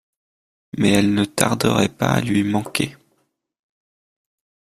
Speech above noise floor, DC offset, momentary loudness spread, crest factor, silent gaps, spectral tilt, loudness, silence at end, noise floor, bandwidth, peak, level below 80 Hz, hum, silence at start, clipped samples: 50 dB; under 0.1%; 7 LU; 22 dB; none; -5 dB/octave; -19 LUFS; 1.85 s; -68 dBFS; 15.5 kHz; 0 dBFS; -52 dBFS; none; 0.75 s; under 0.1%